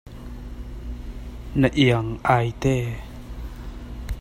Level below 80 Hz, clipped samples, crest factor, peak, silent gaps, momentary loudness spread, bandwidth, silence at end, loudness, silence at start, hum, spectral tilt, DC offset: -36 dBFS; under 0.1%; 22 dB; -4 dBFS; none; 19 LU; 15.5 kHz; 0 s; -22 LUFS; 0.05 s; none; -6.5 dB/octave; under 0.1%